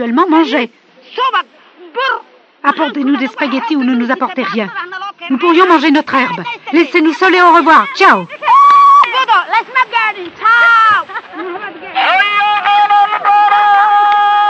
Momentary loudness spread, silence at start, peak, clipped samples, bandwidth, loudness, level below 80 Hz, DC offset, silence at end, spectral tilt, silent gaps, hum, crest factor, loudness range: 14 LU; 0 s; 0 dBFS; 0.2%; 8.6 kHz; -10 LUFS; -70 dBFS; under 0.1%; 0 s; -4 dB/octave; none; none; 10 dB; 8 LU